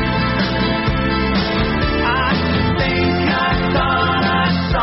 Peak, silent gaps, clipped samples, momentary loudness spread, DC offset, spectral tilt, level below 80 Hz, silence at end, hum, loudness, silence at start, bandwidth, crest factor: -6 dBFS; none; under 0.1%; 2 LU; under 0.1%; -4 dB/octave; -28 dBFS; 0 s; none; -17 LUFS; 0 s; 6 kHz; 12 dB